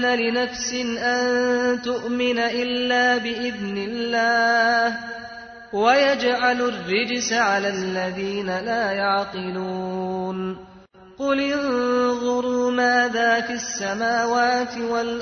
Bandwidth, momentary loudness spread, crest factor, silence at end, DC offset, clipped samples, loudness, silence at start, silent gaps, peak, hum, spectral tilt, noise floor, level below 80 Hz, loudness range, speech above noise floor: 6.6 kHz; 9 LU; 16 dB; 0 s; under 0.1%; under 0.1%; -22 LUFS; 0 s; none; -6 dBFS; none; -3.5 dB/octave; -47 dBFS; -58 dBFS; 5 LU; 25 dB